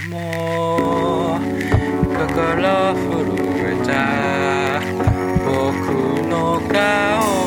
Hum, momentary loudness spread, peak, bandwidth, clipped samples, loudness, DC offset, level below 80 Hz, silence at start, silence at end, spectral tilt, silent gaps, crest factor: none; 4 LU; -2 dBFS; 18 kHz; under 0.1%; -18 LUFS; under 0.1%; -36 dBFS; 0 s; 0 s; -6 dB/octave; none; 16 dB